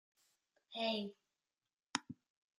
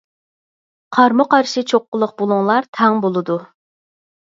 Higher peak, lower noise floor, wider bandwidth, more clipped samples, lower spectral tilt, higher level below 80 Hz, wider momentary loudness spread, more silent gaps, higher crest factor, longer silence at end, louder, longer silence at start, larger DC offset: second, -16 dBFS vs 0 dBFS; about the same, under -90 dBFS vs under -90 dBFS; first, 13 kHz vs 7.8 kHz; neither; second, -3 dB/octave vs -5.5 dB/octave; second, under -90 dBFS vs -70 dBFS; first, 17 LU vs 8 LU; about the same, 1.83-1.87 s vs 1.88-1.92 s, 2.68-2.73 s; first, 32 dB vs 18 dB; second, 0.45 s vs 0.9 s; second, -42 LUFS vs -16 LUFS; second, 0.7 s vs 0.9 s; neither